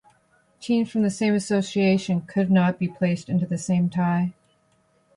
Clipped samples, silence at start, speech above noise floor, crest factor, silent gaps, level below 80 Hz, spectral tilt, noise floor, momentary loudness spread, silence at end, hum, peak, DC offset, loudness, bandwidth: under 0.1%; 0.6 s; 42 dB; 14 dB; none; -62 dBFS; -6.5 dB/octave; -64 dBFS; 5 LU; 0.85 s; none; -8 dBFS; under 0.1%; -23 LUFS; 11.5 kHz